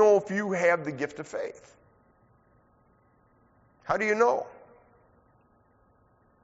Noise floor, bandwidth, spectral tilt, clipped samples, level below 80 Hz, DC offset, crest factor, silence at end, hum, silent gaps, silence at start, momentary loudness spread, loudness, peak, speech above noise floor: -64 dBFS; 8 kHz; -4.5 dB/octave; under 0.1%; -68 dBFS; under 0.1%; 20 dB; 1.95 s; none; none; 0 s; 18 LU; -27 LUFS; -10 dBFS; 36 dB